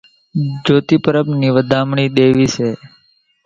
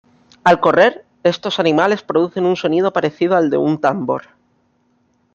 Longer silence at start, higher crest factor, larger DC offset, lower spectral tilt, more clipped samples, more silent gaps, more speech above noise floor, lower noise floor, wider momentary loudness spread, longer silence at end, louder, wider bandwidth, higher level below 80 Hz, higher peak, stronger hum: about the same, 0.35 s vs 0.45 s; about the same, 14 dB vs 16 dB; neither; about the same, -6.5 dB/octave vs -6 dB/octave; neither; neither; second, 42 dB vs 46 dB; second, -56 dBFS vs -61 dBFS; about the same, 9 LU vs 7 LU; second, 0.6 s vs 1.15 s; about the same, -15 LUFS vs -16 LUFS; about the same, 7.6 kHz vs 8 kHz; first, -50 dBFS vs -60 dBFS; about the same, 0 dBFS vs 0 dBFS; neither